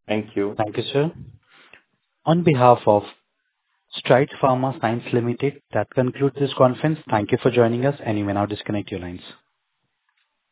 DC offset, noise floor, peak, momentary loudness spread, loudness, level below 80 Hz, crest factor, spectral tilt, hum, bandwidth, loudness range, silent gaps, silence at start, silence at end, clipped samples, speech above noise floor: under 0.1%; -75 dBFS; 0 dBFS; 11 LU; -21 LUFS; -54 dBFS; 22 dB; -11 dB/octave; none; 4 kHz; 3 LU; none; 0.1 s; 1.2 s; under 0.1%; 54 dB